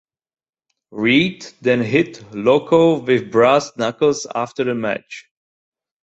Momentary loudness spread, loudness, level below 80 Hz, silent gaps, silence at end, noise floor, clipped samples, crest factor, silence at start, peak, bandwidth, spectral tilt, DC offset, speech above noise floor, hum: 10 LU; -17 LUFS; -58 dBFS; none; 0.85 s; -76 dBFS; under 0.1%; 16 dB; 0.95 s; -2 dBFS; 8 kHz; -5.5 dB/octave; under 0.1%; 59 dB; none